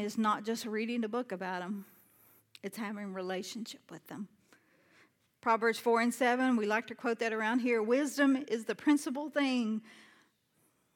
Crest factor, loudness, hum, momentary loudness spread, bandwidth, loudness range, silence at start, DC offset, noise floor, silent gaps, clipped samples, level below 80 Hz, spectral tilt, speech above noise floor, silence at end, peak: 18 dB; -32 LUFS; none; 15 LU; 18 kHz; 12 LU; 0 s; under 0.1%; -74 dBFS; none; under 0.1%; under -90 dBFS; -4.5 dB/octave; 41 dB; 0.95 s; -16 dBFS